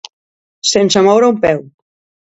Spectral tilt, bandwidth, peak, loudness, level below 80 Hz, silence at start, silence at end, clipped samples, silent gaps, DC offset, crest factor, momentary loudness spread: -3.5 dB/octave; 8 kHz; 0 dBFS; -12 LUFS; -50 dBFS; 0.65 s; 0.7 s; under 0.1%; none; under 0.1%; 14 dB; 8 LU